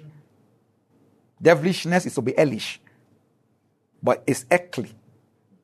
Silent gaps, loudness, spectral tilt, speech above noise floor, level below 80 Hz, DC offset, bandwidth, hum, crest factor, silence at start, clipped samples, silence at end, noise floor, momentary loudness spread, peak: none; -22 LUFS; -5.5 dB/octave; 46 dB; -70 dBFS; under 0.1%; 13.5 kHz; none; 22 dB; 0.05 s; under 0.1%; 0.75 s; -67 dBFS; 15 LU; -4 dBFS